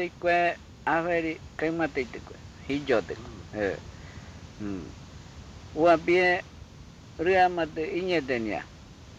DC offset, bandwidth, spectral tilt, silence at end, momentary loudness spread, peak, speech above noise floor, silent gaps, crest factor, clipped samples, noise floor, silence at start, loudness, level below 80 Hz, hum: under 0.1%; 8.4 kHz; -6 dB/octave; 0.05 s; 23 LU; -12 dBFS; 21 dB; none; 18 dB; under 0.1%; -47 dBFS; 0 s; -27 LUFS; -52 dBFS; none